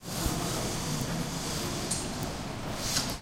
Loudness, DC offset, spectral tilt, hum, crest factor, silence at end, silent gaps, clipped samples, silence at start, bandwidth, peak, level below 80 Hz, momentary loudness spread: -32 LUFS; under 0.1%; -3.5 dB/octave; none; 18 dB; 0 s; none; under 0.1%; 0 s; 16 kHz; -14 dBFS; -44 dBFS; 6 LU